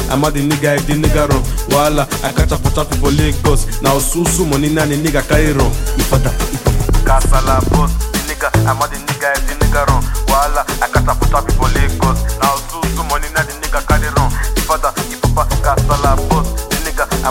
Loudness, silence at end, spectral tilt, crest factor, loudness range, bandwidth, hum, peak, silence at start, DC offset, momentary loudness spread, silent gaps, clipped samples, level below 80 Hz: -15 LUFS; 0 s; -5 dB/octave; 14 dB; 2 LU; 17 kHz; none; 0 dBFS; 0 s; under 0.1%; 4 LU; none; under 0.1%; -18 dBFS